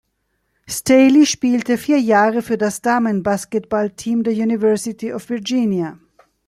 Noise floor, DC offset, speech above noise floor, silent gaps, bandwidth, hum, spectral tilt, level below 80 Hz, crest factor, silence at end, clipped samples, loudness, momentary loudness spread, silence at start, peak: -69 dBFS; under 0.1%; 53 dB; none; 15 kHz; none; -4.5 dB/octave; -56 dBFS; 16 dB; 0.5 s; under 0.1%; -17 LUFS; 12 LU; 0.7 s; -2 dBFS